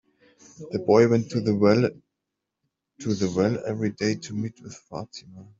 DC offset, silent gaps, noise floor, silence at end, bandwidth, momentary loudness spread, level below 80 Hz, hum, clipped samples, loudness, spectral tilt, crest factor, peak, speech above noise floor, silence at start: under 0.1%; none; -84 dBFS; 0.15 s; 7.8 kHz; 19 LU; -62 dBFS; none; under 0.1%; -24 LUFS; -6.5 dB/octave; 20 dB; -4 dBFS; 60 dB; 0.6 s